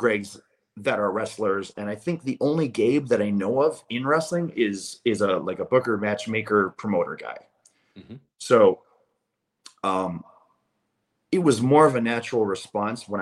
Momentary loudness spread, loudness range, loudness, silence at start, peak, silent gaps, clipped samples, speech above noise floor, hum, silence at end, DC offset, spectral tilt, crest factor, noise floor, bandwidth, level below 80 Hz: 12 LU; 2 LU; -24 LUFS; 0 s; -4 dBFS; none; under 0.1%; 55 dB; none; 0 s; under 0.1%; -6 dB/octave; 20 dB; -79 dBFS; 12.5 kHz; -68 dBFS